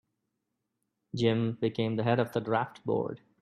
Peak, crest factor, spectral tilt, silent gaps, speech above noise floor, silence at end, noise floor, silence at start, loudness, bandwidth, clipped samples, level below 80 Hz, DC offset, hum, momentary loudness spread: -12 dBFS; 18 dB; -7.5 dB/octave; none; 53 dB; 0.25 s; -83 dBFS; 1.15 s; -30 LUFS; 12.5 kHz; under 0.1%; -68 dBFS; under 0.1%; none; 5 LU